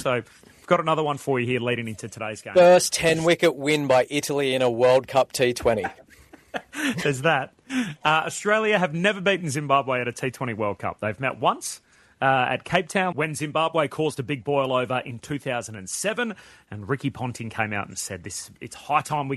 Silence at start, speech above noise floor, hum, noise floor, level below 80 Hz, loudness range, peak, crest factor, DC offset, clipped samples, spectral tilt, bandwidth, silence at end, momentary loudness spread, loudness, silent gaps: 0 s; 22 dB; none; -46 dBFS; -58 dBFS; 8 LU; -2 dBFS; 22 dB; under 0.1%; under 0.1%; -4.5 dB/octave; 13.5 kHz; 0 s; 12 LU; -23 LUFS; none